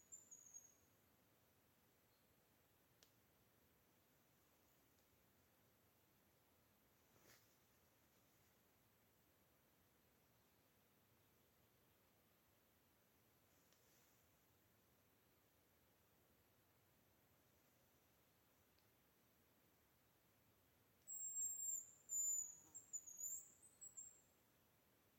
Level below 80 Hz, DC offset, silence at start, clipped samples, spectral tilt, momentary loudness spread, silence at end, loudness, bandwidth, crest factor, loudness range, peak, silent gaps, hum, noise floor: under -90 dBFS; under 0.1%; 0.1 s; under 0.1%; -0.5 dB/octave; 19 LU; 1 s; -47 LUFS; 16.5 kHz; 22 dB; 15 LU; -38 dBFS; none; none; -79 dBFS